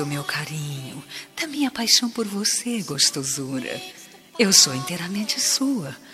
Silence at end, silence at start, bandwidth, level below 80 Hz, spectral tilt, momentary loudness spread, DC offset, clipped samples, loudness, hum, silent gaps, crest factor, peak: 0 s; 0 s; 16 kHz; -66 dBFS; -2 dB/octave; 19 LU; under 0.1%; under 0.1%; -21 LUFS; none; none; 24 dB; 0 dBFS